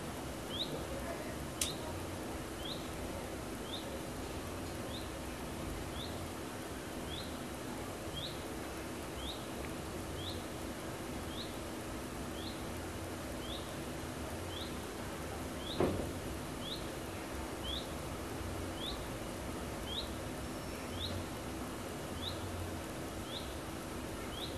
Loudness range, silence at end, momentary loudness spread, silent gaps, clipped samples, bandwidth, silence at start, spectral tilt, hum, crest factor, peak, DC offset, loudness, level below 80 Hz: 2 LU; 0 s; 3 LU; none; under 0.1%; 13 kHz; 0 s; -4 dB/octave; none; 26 dB; -14 dBFS; under 0.1%; -42 LUFS; -52 dBFS